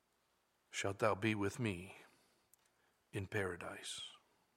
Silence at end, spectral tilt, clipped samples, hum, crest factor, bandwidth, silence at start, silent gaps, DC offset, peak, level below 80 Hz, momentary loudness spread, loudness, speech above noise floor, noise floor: 0.4 s; -5 dB/octave; under 0.1%; none; 24 dB; 16 kHz; 0.7 s; none; under 0.1%; -20 dBFS; -76 dBFS; 13 LU; -41 LUFS; 40 dB; -80 dBFS